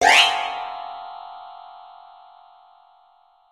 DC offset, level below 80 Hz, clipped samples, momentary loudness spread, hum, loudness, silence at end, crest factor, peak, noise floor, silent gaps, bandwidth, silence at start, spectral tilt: under 0.1%; -64 dBFS; under 0.1%; 28 LU; none; -19 LUFS; 1.7 s; 24 dB; -2 dBFS; -57 dBFS; none; 16 kHz; 0 s; 1 dB/octave